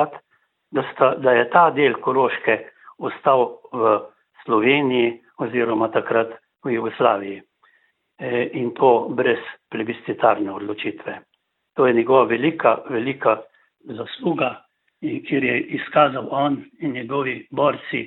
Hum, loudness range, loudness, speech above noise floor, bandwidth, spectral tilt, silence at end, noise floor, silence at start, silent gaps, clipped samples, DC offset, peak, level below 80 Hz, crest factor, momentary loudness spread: none; 4 LU; -20 LUFS; 43 dB; 4.2 kHz; -10 dB/octave; 0 s; -63 dBFS; 0 s; none; under 0.1%; under 0.1%; 0 dBFS; -68 dBFS; 20 dB; 14 LU